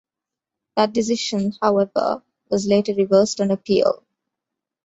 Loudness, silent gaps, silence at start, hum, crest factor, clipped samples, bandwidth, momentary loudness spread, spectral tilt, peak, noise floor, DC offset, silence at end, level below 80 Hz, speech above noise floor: -20 LUFS; none; 0.75 s; none; 18 dB; under 0.1%; 8 kHz; 8 LU; -5 dB/octave; -4 dBFS; -87 dBFS; under 0.1%; 0.9 s; -60 dBFS; 68 dB